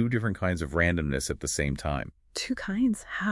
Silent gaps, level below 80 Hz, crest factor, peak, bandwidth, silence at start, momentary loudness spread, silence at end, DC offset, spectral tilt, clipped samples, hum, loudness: none; -44 dBFS; 18 dB; -10 dBFS; 12 kHz; 0 s; 7 LU; 0 s; under 0.1%; -5 dB/octave; under 0.1%; none; -29 LUFS